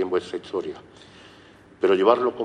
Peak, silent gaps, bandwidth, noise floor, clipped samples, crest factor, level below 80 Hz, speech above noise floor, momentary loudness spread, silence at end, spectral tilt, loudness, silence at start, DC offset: -2 dBFS; none; 10 kHz; -50 dBFS; under 0.1%; 22 dB; -66 dBFS; 27 dB; 16 LU; 0 s; -6 dB/octave; -23 LUFS; 0 s; under 0.1%